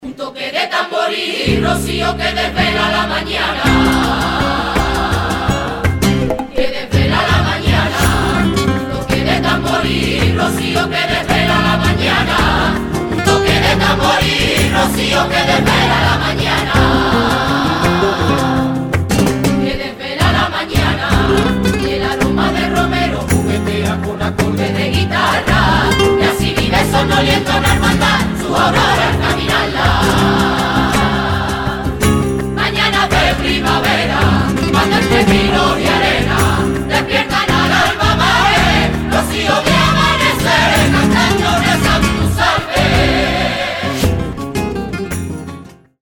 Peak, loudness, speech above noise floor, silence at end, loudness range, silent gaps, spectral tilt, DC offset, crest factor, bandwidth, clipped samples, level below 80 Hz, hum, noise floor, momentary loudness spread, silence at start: 0 dBFS; -13 LUFS; 21 dB; 0.3 s; 3 LU; none; -5 dB/octave; under 0.1%; 14 dB; 19 kHz; under 0.1%; -26 dBFS; none; -34 dBFS; 5 LU; 0 s